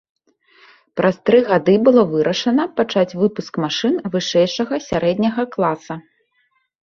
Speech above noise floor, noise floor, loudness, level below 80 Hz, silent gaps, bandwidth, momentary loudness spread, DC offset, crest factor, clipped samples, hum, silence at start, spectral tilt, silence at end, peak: 48 dB; -65 dBFS; -17 LUFS; -56 dBFS; none; 7.2 kHz; 9 LU; under 0.1%; 16 dB; under 0.1%; none; 0.95 s; -5.5 dB/octave; 0.8 s; -2 dBFS